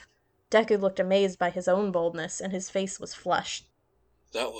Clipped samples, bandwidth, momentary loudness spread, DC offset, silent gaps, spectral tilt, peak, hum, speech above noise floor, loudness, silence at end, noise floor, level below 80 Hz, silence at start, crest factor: under 0.1%; 14.5 kHz; 11 LU; under 0.1%; none; -4 dB/octave; -10 dBFS; none; 43 dB; -28 LUFS; 0 s; -70 dBFS; -66 dBFS; 0 s; 20 dB